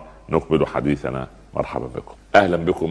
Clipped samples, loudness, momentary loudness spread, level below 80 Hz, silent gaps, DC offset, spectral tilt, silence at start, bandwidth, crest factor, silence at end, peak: under 0.1%; -21 LUFS; 14 LU; -42 dBFS; none; under 0.1%; -7 dB/octave; 0 s; 11 kHz; 22 dB; 0 s; 0 dBFS